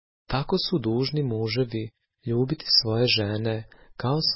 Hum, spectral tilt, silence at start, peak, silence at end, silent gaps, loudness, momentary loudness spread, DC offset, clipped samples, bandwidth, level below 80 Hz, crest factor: none; -8.5 dB/octave; 0.3 s; -6 dBFS; 0 s; none; -25 LUFS; 14 LU; under 0.1%; under 0.1%; 6 kHz; -50 dBFS; 20 dB